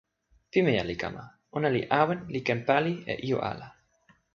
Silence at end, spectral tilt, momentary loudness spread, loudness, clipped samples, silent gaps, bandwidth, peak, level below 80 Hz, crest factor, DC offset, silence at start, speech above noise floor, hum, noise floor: 0.65 s; -7 dB/octave; 11 LU; -28 LUFS; under 0.1%; none; 7.2 kHz; -6 dBFS; -58 dBFS; 24 dB; under 0.1%; 0.55 s; 38 dB; none; -65 dBFS